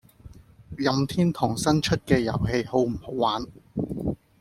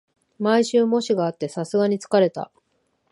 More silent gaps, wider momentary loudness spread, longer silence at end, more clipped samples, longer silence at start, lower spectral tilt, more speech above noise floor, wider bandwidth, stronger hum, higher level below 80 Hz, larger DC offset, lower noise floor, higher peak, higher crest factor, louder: neither; about the same, 9 LU vs 10 LU; second, 0.25 s vs 0.65 s; neither; second, 0.25 s vs 0.4 s; about the same, -6 dB/octave vs -5.5 dB/octave; second, 24 dB vs 49 dB; first, 15.5 kHz vs 11.5 kHz; neither; first, -46 dBFS vs -74 dBFS; neither; second, -48 dBFS vs -69 dBFS; about the same, -6 dBFS vs -4 dBFS; about the same, 18 dB vs 18 dB; second, -25 LUFS vs -21 LUFS